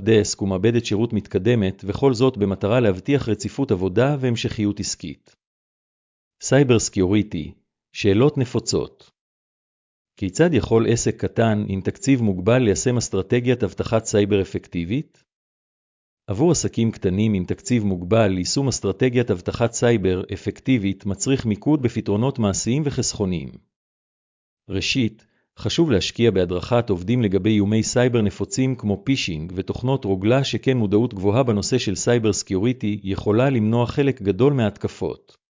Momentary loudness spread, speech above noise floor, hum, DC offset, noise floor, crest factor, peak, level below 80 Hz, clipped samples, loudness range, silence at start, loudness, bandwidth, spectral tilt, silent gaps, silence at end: 8 LU; over 70 dB; none; under 0.1%; under -90 dBFS; 16 dB; -4 dBFS; -42 dBFS; under 0.1%; 4 LU; 0 s; -21 LUFS; 7.8 kHz; -5.5 dB/octave; 5.47-6.31 s, 9.21-10.05 s, 15.34-16.17 s, 23.76-24.57 s; 0.4 s